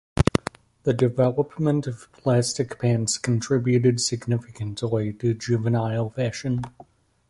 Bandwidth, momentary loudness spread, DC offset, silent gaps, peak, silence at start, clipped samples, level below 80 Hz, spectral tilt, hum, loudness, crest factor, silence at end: 11.5 kHz; 9 LU; under 0.1%; none; -2 dBFS; 0.15 s; under 0.1%; -44 dBFS; -6 dB/octave; none; -24 LUFS; 20 dB; 0.6 s